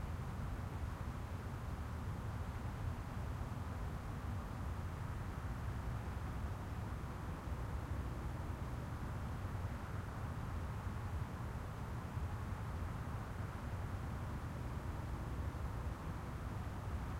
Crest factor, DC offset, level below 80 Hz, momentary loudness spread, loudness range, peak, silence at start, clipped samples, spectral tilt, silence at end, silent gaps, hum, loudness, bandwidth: 12 dB; under 0.1%; -48 dBFS; 2 LU; 0 LU; -30 dBFS; 0 s; under 0.1%; -7 dB/octave; 0 s; none; none; -45 LUFS; 16 kHz